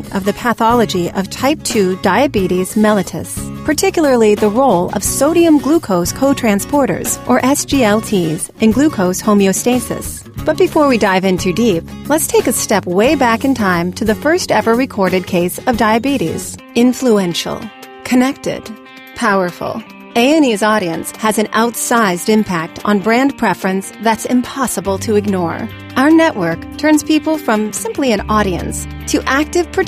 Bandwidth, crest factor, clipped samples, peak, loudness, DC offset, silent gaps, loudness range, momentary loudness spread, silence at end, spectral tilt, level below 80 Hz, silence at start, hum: 15.5 kHz; 12 dB; under 0.1%; 0 dBFS; -14 LUFS; under 0.1%; none; 3 LU; 9 LU; 0 s; -4.5 dB/octave; -38 dBFS; 0 s; none